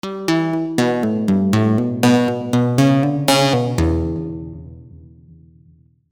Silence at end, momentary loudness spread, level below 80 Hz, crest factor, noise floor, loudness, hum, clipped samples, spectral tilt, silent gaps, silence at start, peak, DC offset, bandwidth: 1.15 s; 10 LU; -36 dBFS; 16 dB; -52 dBFS; -17 LUFS; none; under 0.1%; -6 dB/octave; none; 0.05 s; -2 dBFS; 0.1%; over 20 kHz